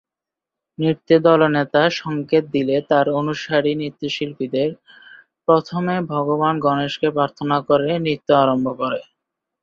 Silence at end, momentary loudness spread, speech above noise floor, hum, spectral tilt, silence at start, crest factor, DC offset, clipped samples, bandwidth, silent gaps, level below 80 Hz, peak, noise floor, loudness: 0.6 s; 9 LU; 68 dB; none; -7 dB/octave; 0.8 s; 18 dB; under 0.1%; under 0.1%; 7.2 kHz; none; -60 dBFS; -2 dBFS; -87 dBFS; -19 LUFS